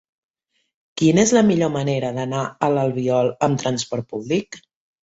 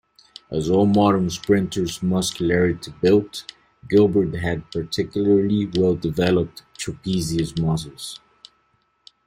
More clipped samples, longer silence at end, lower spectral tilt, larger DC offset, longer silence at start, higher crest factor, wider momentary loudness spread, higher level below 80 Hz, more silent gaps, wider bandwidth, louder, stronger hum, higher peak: neither; second, 0.45 s vs 1.1 s; about the same, -5.5 dB/octave vs -6 dB/octave; neither; first, 0.95 s vs 0.5 s; about the same, 18 dB vs 18 dB; second, 11 LU vs 14 LU; second, -56 dBFS vs -48 dBFS; neither; second, 8 kHz vs 16 kHz; about the same, -20 LUFS vs -21 LUFS; neither; about the same, -4 dBFS vs -2 dBFS